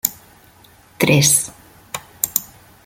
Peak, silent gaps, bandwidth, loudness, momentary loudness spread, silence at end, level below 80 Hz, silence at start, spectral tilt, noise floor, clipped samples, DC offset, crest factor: 0 dBFS; none; 17 kHz; -16 LUFS; 19 LU; 0.4 s; -52 dBFS; 0.05 s; -3 dB/octave; -49 dBFS; under 0.1%; under 0.1%; 22 dB